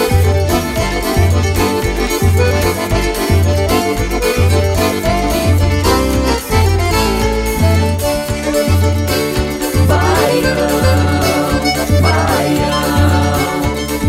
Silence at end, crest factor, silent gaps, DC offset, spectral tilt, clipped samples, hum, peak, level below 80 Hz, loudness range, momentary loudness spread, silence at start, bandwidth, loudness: 0 s; 12 dB; none; under 0.1%; -5.5 dB/octave; under 0.1%; none; 0 dBFS; -22 dBFS; 1 LU; 4 LU; 0 s; 16.5 kHz; -14 LUFS